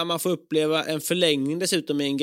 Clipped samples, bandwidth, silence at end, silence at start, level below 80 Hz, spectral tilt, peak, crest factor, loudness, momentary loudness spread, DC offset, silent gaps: under 0.1%; 16.5 kHz; 0 s; 0 s; -74 dBFS; -4 dB/octave; -6 dBFS; 18 dB; -24 LUFS; 4 LU; under 0.1%; none